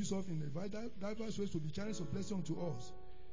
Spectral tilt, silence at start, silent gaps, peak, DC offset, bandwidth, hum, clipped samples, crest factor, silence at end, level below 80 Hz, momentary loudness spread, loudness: -6 dB/octave; 0 s; none; -28 dBFS; 0.8%; 7.6 kHz; none; under 0.1%; 16 dB; 0 s; -60 dBFS; 5 LU; -43 LUFS